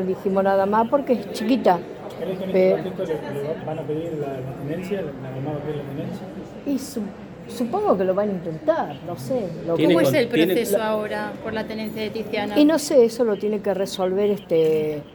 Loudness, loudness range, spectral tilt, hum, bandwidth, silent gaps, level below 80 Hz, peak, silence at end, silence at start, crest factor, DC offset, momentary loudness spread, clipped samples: -23 LUFS; 8 LU; -6 dB/octave; none; 19 kHz; none; -56 dBFS; -4 dBFS; 0 s; 0 s; 18 dB; under 0.1%; 13 LU; under 0.1%